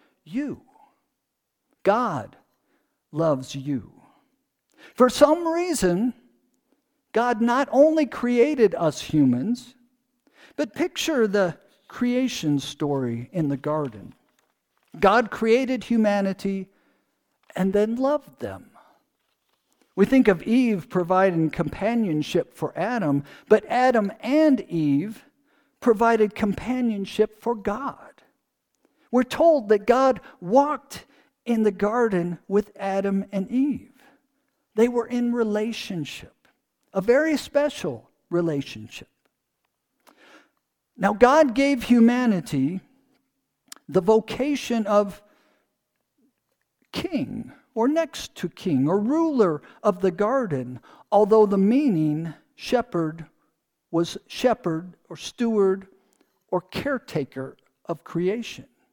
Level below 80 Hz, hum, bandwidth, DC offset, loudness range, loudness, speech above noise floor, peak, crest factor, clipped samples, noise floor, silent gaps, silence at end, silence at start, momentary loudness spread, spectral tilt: -56 dBFS; none; 19 kHz; under 0.1%; 7 LU; -23 LUFS; 57 dB; -2 dBFS; 22 dB; under 0.1%; -79 dBFS; none; 0.3 s; 0.3 s; 15 LU; -6 dB/octave